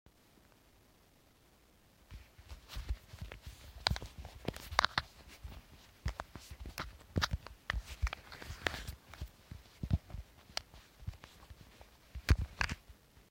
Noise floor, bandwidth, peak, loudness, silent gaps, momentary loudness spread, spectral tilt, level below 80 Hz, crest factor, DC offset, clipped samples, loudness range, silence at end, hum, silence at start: -66 dBFS; 16.5 kHz; -6 dBFS; -40 LUFS; none; 22 LU; -4 dB/octave; -46 dBFS; 36 dB; under 0.1%; under 0.1%; 6 LU; 0.1 s; none; 2.1 s